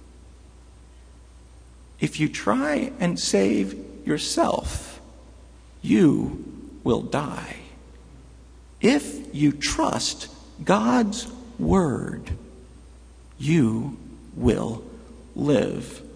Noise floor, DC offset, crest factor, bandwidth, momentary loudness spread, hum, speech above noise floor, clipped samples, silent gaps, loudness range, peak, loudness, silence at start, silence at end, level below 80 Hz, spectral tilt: -48 dBFS; under 0.1%; 20 dB; 11 kHz; 16 LU; none; 25 dB; under 0.1%; none; 3 LU; -4 dBFS; -24 LUFS; 0 s; 0 s; -44 dBFS; -5.5 dB/octave